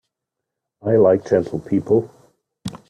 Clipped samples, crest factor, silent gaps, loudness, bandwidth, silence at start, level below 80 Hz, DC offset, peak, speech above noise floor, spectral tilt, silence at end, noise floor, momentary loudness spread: under 0.1%; 18 dB; none; -18 LUFS; 10.5 kHz; 0.85 s; -56 dBFS; under 0.1%; -4 dBFS; 65 dB; -8.5 dB/octave; 0.15 s; -82 dBFS; 19 LU